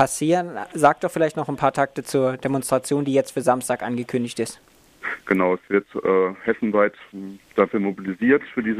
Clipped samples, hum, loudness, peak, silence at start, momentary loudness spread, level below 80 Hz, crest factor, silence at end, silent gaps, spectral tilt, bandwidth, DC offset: under 0.1%; none; -22 LUFS; -2 dBFS; 0 s; 10 LU; -60 dBFS; 20 dB; 0 s; none; -5.5 dB/octave; 15.5 kHz; under 0.1%